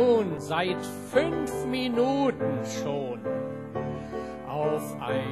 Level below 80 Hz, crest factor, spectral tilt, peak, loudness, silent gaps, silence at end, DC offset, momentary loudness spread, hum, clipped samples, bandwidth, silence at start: -56 dBFS; 18 dB; -5.5 dB/octave; -10 dBFS; -29 LUFS; none; 0 s; 0.1%; 9 LU; none; under 0.1%; 13 kHz; 0 s